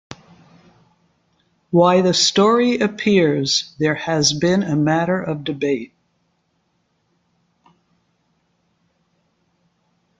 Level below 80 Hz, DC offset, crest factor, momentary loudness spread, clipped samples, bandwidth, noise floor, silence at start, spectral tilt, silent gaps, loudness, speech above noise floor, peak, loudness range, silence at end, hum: -60 dBFS; under 0.1%; 20 dB; 9 LU; under 0.1%; 9.4 kHz; -67 dBFS; 0.1 s; -4.5 dB/octave; none; -17 LUFS; 50 dB; -2 dBFS; 12 LU; 4.35 s; none